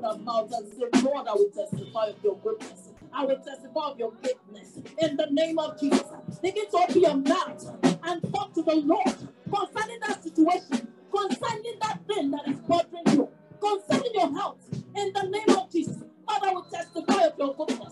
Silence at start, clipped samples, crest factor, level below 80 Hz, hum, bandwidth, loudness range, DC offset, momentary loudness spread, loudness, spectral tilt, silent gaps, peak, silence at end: 0 s; under 0.1%; 20 dB; -72 dBFS; none; 12 kHz; 4 LU; under 0.1%; 11 LU; -27 LUFS; -5 dB/octave; none; -6 dBFS; 0 s